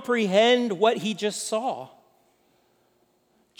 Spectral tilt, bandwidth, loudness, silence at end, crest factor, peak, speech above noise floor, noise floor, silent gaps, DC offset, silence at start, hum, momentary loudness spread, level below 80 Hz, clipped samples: -3.5 dB/octave; 19 kHz; -23 LUFS; 1.7 s; 18 dB; -8 dBFS; 43 dB; -66 dBFS; none; under 0.1%; 0 s; none; 14 LU; -84 dBFS; under 0.1%